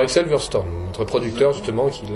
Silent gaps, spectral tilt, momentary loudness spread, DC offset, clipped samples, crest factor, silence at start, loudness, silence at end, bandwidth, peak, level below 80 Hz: none; -5 dB/octave; 6 LU; under 0.1%; under 0.1%; 16 dB; 0 s; -21 LUFS; 0 s; 11.5 kHz; -4 dBFS; -40 dBFS